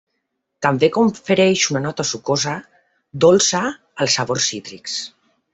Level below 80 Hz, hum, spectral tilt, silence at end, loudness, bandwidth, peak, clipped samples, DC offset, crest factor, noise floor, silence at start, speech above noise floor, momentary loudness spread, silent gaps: -58 dBFS; none; -3.5 dB/octave; 0.45 s; -18 LUFS; 8.4 kHz; 0 dBFS; under 0.1%; under 0.1%; 20 dB; -74 dBFS; 0.6 s; 57 dB; 12 LU; none